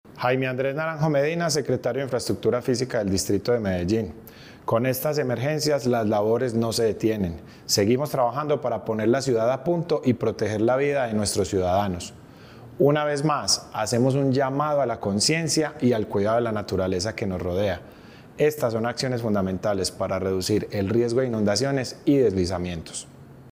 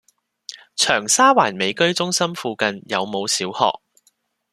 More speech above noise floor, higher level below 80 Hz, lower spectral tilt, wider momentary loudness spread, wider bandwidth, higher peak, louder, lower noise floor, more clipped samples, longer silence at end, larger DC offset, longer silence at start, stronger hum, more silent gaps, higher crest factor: second, 21 dB vs 44 dB; first, -56 dBFS vs -64 dBFS; first, -5 dB/octave vs -2 dB/octave; second, 6 LU vs 18 LU; first, 16.5 kHz vs 14 kHz; second, -8 dBFS vs 0 dBFS; second, -24 LUFS vs -18 LUFS; second, -45 dBFS vs -64 dBFS; neither; second, 0 s vs 0.8 s; neither; second, 0.05 s vs 0.5 s; neither; neither; about the same, 16 dB vs 20 dB